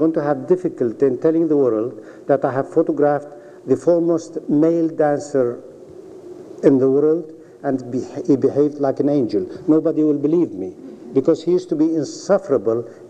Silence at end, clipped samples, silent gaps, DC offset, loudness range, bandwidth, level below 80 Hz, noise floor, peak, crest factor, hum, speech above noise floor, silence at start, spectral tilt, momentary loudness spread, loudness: 0 s; under 0.1%; none; under 0.1%; 1 LU; 8.8 kHz; -68 dBFS; -39 dBFS; -2 dBFS; 16 dB; none; 21 dB; 0 s; -8 dB/octave; 13 LU; -19 LUFS